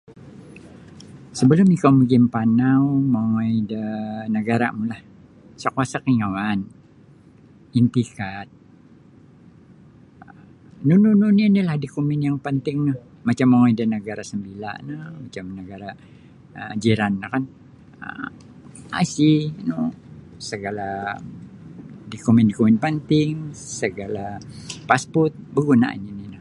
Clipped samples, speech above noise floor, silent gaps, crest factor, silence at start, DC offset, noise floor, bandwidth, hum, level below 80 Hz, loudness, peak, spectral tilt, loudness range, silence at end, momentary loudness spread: under 0.1%; 29 dB; none; 20 dB; 0.1 s; under 0.1%; -49 dBFS; 11 kHz; none; -56 dBFS; -20 LUFS; 0 dBFS; -7 dB/octave; 9 LU; 0 s; 19 LU